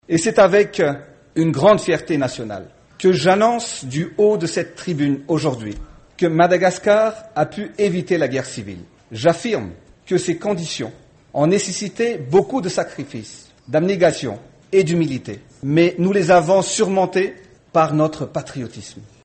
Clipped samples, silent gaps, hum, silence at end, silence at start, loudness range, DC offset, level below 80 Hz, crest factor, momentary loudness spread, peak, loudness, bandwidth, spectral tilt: under 0.1%; none; none; 0.2 s; 0.1 s; 4 LU; under 0.1%; -50 dBFS; 16 dB; 17 LU; -2 dBFS; -18 LUFS; 8.8 kHz; -5.5 dB/octave